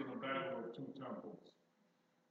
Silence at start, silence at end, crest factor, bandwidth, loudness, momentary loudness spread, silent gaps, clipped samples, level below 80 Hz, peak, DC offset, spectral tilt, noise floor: 0 s; 0.8 s; 20 dB; 7.2 kHz; -46 LUFS; 13 LU; none; under 0.1%; under -90 dBFS; -28 dBFS; under 0.1%; -3.5 dB/octave; -77 dBFS